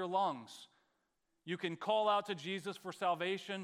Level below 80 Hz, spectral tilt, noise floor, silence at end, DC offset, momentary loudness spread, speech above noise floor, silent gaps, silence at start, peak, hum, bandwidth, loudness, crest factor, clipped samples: under -90 dBFS; -4.5 dB/octave; -83 dBFS; 0 s; under 0.1%; 16 LU; 45 dB; none; 0 s; -20 dBFS; none; 15.5 kHz; -37 LUFS; 18 dB; under 0.1%